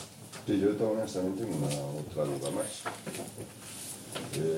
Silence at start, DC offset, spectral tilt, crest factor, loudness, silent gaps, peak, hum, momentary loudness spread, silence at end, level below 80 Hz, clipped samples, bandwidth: 0 s; under 0.1%; -5 dB/octave; 18 dB; -34 LUFS; none; -16 dBFS; none; 13 LU; 0 s; -66 dBFS; under 0.1%; 16.5 kHz